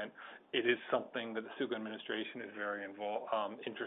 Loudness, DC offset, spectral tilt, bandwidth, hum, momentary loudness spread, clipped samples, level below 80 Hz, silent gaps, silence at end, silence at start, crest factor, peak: -39 LUFS; under 0.1%; 0.5 dB/octave; 3.9 kHz; none; 9 LU; under 0.1%; -86 dBFS; none; 0 s; 0 s; 20 dB; -18 dBFS